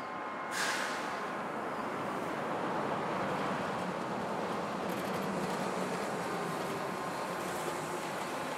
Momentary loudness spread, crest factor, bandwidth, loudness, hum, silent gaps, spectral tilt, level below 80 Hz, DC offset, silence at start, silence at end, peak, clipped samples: 3 LU; 16 dB; 16 kHz; -36 LUFS; none; none; -4 dB/octave; -72 dBFS; under 0.1%; 0 s; 0 s; -20 dBFS; under 0.1%